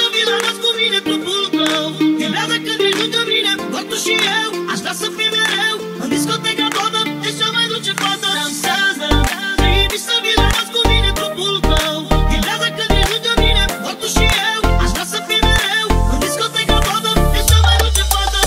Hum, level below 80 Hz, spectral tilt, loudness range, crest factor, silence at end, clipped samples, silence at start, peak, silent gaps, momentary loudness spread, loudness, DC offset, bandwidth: none; -22 dBFS; -3.5 dB/octave; 2 LU; 16 dB; 0 s; under 0.1%; 0 s; 0 dBFS; none; 5 LU; -15 LUFS; under 0.1%; 16.5 kHz